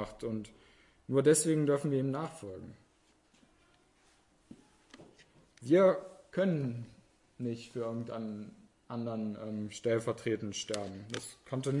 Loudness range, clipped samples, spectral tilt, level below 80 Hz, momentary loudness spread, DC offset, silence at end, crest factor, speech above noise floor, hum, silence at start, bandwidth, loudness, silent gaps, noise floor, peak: 8 LU; under 0.1%; -5.5 dB/octave; -70 dBFS; 20 LU; under 0.1%; 0 s; 22 dB; 36 dB; none; 0 s; 11.5 kHz; -33 LUFS; none; -69 dBFS; -14 dBFS